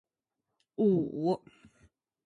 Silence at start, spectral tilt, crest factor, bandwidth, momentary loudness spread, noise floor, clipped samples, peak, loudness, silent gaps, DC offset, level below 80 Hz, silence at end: 0.8 s; -10 dB/octave; 18 dB; 10 kHz; 10 LU; -87 dBFS; under 0.1%; -16 dBFS; -30 LUFS; none; under 0.1%; -72 dBFS; 0.9 s